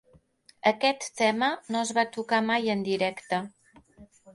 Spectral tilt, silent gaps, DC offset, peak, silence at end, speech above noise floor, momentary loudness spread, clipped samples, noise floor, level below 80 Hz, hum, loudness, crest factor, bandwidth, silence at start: -3.5 dB/octave; none; under 0.1%; -8 dBFS; 0.05 s; 33 dB; 7 LU; under 0.1%; -60 dBFS; -70 dBFS; none; -27 LUFS; 20 dB; 11.5 kHz; 0.65 s